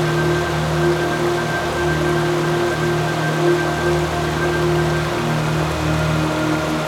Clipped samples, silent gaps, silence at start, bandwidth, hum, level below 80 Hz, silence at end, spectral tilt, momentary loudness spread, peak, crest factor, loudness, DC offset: under 0.1%; none; 0 s; 17 kHz; none; -38 dBFS; 0 s; -5.5 dB/octave; 2 LU; -6 dBFS; 12 dB; -19 LUFS; under 0.1%